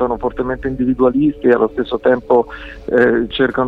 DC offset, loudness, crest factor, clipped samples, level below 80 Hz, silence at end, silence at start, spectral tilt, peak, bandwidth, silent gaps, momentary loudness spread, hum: under 0.1%; -16 LUFS; 14 dB; under 0.1%; -38 dBFS; 0 s; 0 s; -8 dB/octave; 0 dBFS; 5 kHz; none; 7 LU; none